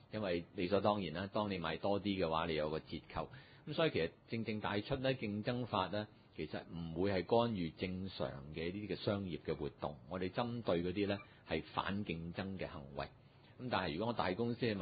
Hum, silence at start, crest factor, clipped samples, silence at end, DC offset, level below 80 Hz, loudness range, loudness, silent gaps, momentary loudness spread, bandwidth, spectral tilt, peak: none; 0.1 s; 20 dB; under 0.1%; 0 s; under 0.1%; -60 dBFS; 3 LU; -40 LUFS; none; 10 LU; 4.9 kHz; -4.5 dB/octave; -20 dBFS